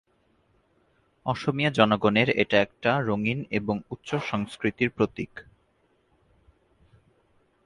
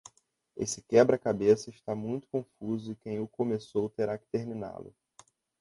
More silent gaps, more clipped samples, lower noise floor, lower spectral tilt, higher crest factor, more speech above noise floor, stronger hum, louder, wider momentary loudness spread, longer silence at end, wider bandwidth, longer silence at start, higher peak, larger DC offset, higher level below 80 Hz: neither; neither; about the same, -67 dBFS vs -68 dBFS; about the same, -6.5 dB/octave vs -6 dB/octave; about the same, 24 dB vs 22 dB; first, 42 dB vs 38 dB; neither; first, -25 LUFS vs -31 LUFS; second, 11 LU vs 14 LU; first, 2.25 s vs 0.7 s; about the same, 11 kHz vs 11.5 kHz; first, 1.25 s vs 0.55 s; first, -4 dBFS vs -10 dBFS; neither; first, -58 dBFS vs -66 dBFS